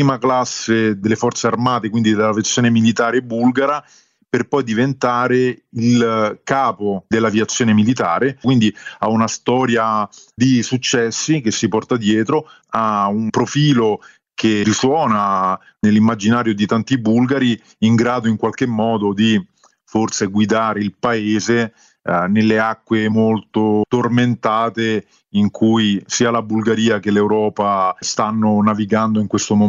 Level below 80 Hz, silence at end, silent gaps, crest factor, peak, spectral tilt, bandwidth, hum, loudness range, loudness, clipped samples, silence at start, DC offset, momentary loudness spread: -56 dBFS; 0 s; none; 14 dB; -2 dBFS; -5 dB/octave; 7.8 kHz; none; 2 LU; -17 LUFS; under 0.1%; 0 s; under 0.1%; 5 LU